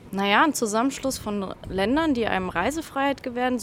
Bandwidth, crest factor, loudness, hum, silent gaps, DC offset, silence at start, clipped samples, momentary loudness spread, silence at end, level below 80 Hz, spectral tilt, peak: 16.5 kHz; 20 dB; -24 LUFS; none; none; under 0.1%; 0 s; under 0.1%; 9 LU; 0 s; -48 dBFS; -4 dB/octave; -4 dBFS